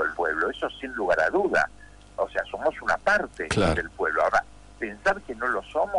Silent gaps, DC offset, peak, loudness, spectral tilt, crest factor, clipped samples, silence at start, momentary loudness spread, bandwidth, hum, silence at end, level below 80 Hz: none; under 0.1%; -12 dBFS; -26 LUFS; -5 dB/octave; 14 dB; under 0.1%; 0 s; 9 LU; 11 kHz; none; 0 s; -46 dBFS